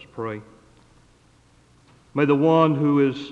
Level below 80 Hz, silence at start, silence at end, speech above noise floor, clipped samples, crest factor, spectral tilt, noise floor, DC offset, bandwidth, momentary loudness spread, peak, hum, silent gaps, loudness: -62 dBFS; 0.15 s; 0 s; 37 dB; under 0.1%; 18 dB; -8.5 dB/octave; -56 dBFS; under 0.1%; 7.4 kHz; 15 LU; -4 dBFS; 60 Hz at -60 dBFS; none; -20 LUFS